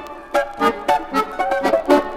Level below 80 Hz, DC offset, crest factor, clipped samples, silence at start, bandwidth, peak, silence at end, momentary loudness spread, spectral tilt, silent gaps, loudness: -46 dBFS; under 0.1%; 16 dB; under 0.1%; 0 s; 16.5 kHz; -2 dBFS; 0 s; 6 LU; -4.5 dB/octave; none; -19 LUFS